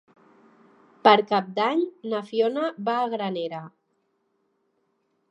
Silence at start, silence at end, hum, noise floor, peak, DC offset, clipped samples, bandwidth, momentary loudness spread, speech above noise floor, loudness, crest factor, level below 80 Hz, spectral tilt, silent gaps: 1.05 s; 1.6 s; none; -72 dBFS; -2 dBFS; under 0.1%; under 0.1%; 8.4 kHz; 13 LU; 49 dB; -24 LUFS; 24 dB; -84 dBFS; -6.5 dB/octave; none